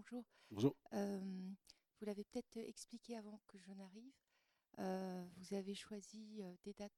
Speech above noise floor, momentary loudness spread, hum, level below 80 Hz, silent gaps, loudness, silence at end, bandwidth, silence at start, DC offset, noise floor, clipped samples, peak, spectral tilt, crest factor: 28 dB; 18 LU; none; -84 dBFS; none; -49 LUFS; 0.1 s; 15 kHz; 0 s; under 0.1%; -76 dBFS; under 0.1%; -24 dBFS; -6 dB/octave; 24 dB